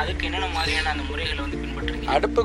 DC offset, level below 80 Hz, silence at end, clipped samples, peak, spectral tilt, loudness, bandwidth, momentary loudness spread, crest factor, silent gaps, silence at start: under 0.1%; -32 dBFS; 0 s; under 0.1%; -6 dBFS; -5 dB/octave; -25 LUFS; 13 kHz; 6 LU; 18 dB; none; 0 s